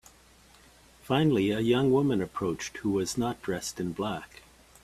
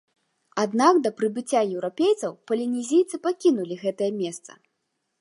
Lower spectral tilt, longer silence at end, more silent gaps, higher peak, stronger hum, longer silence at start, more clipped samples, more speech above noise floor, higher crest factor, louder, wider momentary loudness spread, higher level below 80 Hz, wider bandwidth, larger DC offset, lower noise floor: about the same, -5.5 dB/octave vs -5 dB/octave; about the same, 0.6 s vs 0.7 s; neither; second, -12 dBFS vs -4 dBFS; neither; first, 1.05 s vs 0.55 s; neither; second, 30 dB vs 54 dB; about the same, 18 dB vs 20 dB; second, -28 LUFS vs -24 LUFS; about the same, 10 LU vs 10 LU; first, -58 dBFS vs -80 dBFS; first, 14.5 kHz vs 11.5 kHz; neither; second, -57 dBFS vs -77 dBFS